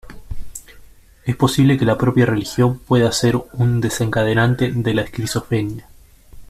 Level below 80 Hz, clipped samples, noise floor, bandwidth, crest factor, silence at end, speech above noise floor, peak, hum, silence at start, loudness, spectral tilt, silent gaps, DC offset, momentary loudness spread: -40 dBFS; under 0.1%; -44 dBFS; 15 kHz; 16 dB; 0.05 s; 27 dB; -2 dBFS; none; 0.05 s; -18 LUFS; -6 dB/octave; none; under 0.1%; 19 LU